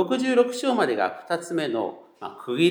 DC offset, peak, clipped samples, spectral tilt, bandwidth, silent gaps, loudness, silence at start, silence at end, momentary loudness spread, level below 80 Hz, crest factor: under 0.1%; -6 dBFS; under 0.1%; -5 dB/octave; 18 kHz; none; -24 LUFS; 0 s; 0 s; 14 LU; -84 dBFS; 18 dB